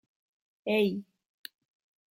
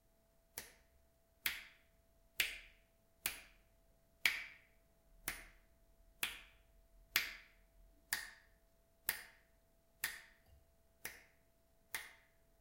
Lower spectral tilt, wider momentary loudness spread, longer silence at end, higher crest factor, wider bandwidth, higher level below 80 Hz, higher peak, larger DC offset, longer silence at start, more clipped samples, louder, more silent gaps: first, -6 dB/octave vs 1 dB/octave; about the same, 20 LU vs 19 LU; first, 1.1 s vs 0.45 s; second, 20 dB vs 38 dB; about the same, 16.5 kHz vs 16 kHz; second, -80 dBFS vs -70 dBFS; about the same, -14 dBFS vs -12 dBFS; neither; about the same, 0.65 s vs 0.55 s; neither; first, -30 LUFS vs -43 LUFS; neither